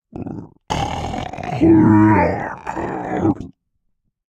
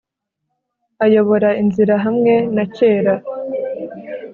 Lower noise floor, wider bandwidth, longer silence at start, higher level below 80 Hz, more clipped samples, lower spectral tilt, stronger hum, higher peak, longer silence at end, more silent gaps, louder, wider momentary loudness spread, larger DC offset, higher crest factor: second, -69 dBFS vs -76 dBFS; first, 8.6 kHz vs 4.5 kHz; second, 0.15 s vs 1 s; first, -42 dBFS vs -60 dBFS; neither; about the same, -7.5 dB/octave vs -6.5 dB/octave; neither; about the same, 0 dBFS vs -2 dBFS; first, 0.8 s vs 0 s; neither; about the same, -17 LUFS vs -16 LUFS; first, 19 LU vs 12 LU; neither; about the same, 18 dB vs 14 dB